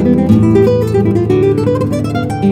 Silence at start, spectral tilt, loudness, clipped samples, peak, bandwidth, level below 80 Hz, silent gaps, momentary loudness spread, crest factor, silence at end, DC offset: 0 s; -9 dB/octave; -12 LUFS; under 0.1%; 0 dBFS; 13.5 kHz; -34 dBFS; none; 6 LU; 10 dB; 0 s; under 0.1%